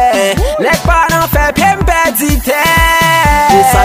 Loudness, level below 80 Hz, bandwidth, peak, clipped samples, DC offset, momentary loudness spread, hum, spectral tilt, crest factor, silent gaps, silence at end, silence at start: -9 LUFS; -18 dBFS; 16.5 kHz; 0 dBFS; 0.2%; under 0.1%; 4 LU; none; -4 dB/octave; 10 dB; none; 0 s; 0 s